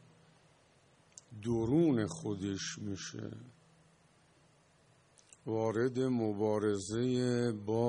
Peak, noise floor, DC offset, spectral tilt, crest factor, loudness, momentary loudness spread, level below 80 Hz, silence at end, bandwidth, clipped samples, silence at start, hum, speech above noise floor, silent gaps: -18 dBFS; -67 dBFS; under 0.1%; -6 dB/octave; 16 dB; -34 LUFS; 14 LU; -66 dBFS; 0 s; 10.5 kHz; under 0.1%; 1.3 s; none; 34 dB; none